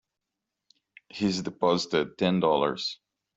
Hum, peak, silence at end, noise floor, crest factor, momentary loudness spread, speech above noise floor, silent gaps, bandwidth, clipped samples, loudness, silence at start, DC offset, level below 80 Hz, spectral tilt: none; -10 dBFS; 0.4 s; -86 dBFS; 20 dB; 10 LU; 60 dB; none; 8 kHz; under 0.1%; -27 LUFS; 1.15 s; under 0.1%; -66 dBFS; -5.5 dB/octave